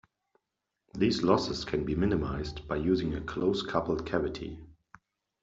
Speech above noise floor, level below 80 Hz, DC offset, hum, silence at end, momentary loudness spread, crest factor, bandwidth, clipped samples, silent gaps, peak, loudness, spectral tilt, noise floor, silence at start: 56 dB; -48 dBFS; under 0.1%; none; 0.7 s; 10 LU; 22 dB; 7.8 kHz; under 0.1%; none; -10 dBFS; -30 LUFS; -6.5 dB/octave; -85 dBFS; 0.95 s